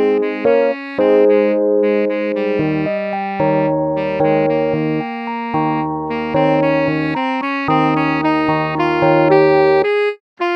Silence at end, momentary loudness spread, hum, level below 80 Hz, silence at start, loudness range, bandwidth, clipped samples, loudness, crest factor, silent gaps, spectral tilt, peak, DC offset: 0 s; 8 LU; none; -50 dBFS; 0 s; 3 LU; 6.4 kHz; under 0.1%; -16 LUFS; 14 dB; 10.20-10.37 s; -8.5 dB/octave; 0 dBFS; under 0.1%